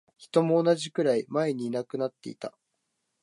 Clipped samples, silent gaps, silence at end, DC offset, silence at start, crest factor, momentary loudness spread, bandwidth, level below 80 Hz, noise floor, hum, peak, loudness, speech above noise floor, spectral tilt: under 0.1%; none; 0.75 s; under 0.1%; 0.2 s; 18 dB; 16 LU; 11.5 kHz; -80 dBFS; -79 dBFS; none; -10 dBFS; -27 LUFS; 52 dB; -6 dB/octave